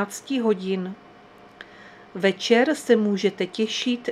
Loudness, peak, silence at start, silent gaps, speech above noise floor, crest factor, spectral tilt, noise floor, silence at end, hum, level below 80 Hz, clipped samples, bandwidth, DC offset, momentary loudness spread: -23 LUFS; -4 dBFS; 0 s; none; 26 dB; 20 dB; -4.5 dB/octave; -49 dBFS; 0 s; none; -70 dBFS; under 0.1%; 14.5 kHz; under 0.1%; 23 LU